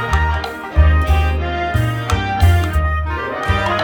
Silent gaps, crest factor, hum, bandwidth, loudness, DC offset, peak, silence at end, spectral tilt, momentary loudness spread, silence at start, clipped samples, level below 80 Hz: none; 14 dB; none; 17.5 kHz; -17 LUFS; under 0.1%; 0 dBFS; 0 s; -6 dB/octave; 7 LU; 0 s; under 0.1%; -18 dBFS